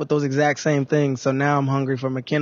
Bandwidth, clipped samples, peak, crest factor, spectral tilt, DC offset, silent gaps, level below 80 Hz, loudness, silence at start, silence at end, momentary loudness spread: 7.4 kHz; under 0.1%; -6 dBFS; 14 dB; -6.5 dB/octave; under 0.1%; none; -66 dBFS; -21 LUFS; 0 s; 0 s; 4 LU